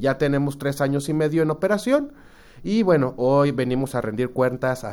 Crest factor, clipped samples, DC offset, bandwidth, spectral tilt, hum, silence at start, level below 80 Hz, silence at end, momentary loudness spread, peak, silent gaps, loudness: 16 dB; under 0.1%; under 0.1%; 18 kHz; -7 dB/octave; none; 0 s; -50 dBFS; 0 s; 6 LU; -6 dBFS; none; -22 LUFS